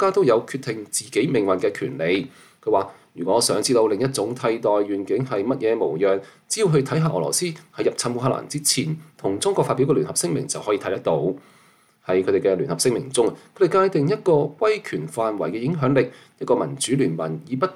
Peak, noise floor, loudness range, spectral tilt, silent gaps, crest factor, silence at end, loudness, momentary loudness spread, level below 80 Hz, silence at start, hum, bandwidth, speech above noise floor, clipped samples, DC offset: -6 dBFS; -56 dBFS; 2 LU; -4.5 dB/octave; none; 16 dB; 0 s; -22 LUFS; 9 LU; -64 dBFS; 0 s; none; 14.5 kHz; 35 dB; under 0.1%; under 0.1%